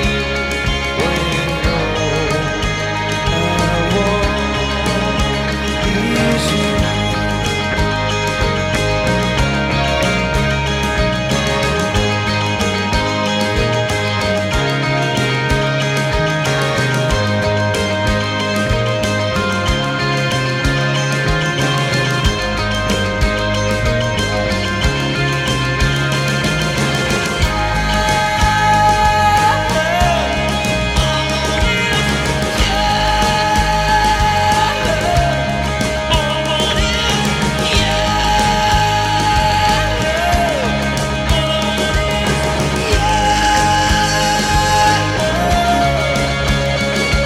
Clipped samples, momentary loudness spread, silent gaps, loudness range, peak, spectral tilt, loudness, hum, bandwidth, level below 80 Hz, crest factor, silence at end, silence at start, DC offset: under 0.1%; 3 LU; none; 3 LU; -4 dBFS; -4.5 dB/octave; -15 LUFS; none; 16 kHz; -24 dBFS; 12 dB; 0 s; 0 s; under 0.1%